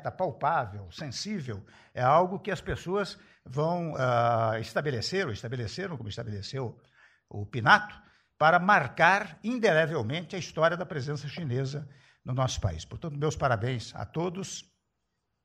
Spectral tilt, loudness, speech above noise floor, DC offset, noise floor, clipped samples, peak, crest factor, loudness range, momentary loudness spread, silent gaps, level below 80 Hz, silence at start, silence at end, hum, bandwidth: -5.5 dB/octave; -28 LUFS; 52 dB; under 0.1%; -81 dBFS; under 0.1%; -4 dBFS; 24 dB; 7 LU; 16 LU; none; -54 dBFS; 0 s; 0.85 s; none; 12 kHz